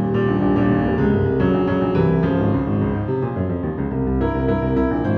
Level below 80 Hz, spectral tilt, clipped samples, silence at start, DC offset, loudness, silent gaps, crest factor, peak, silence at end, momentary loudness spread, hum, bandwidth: -32 dBFS; -10.5 dB/octave; under 0.1%; 0 s; under 0.1%; -19 LUFS; none; 12 dB; -6 dBFS; 0 s; 5 LU; none; 5.6 kHz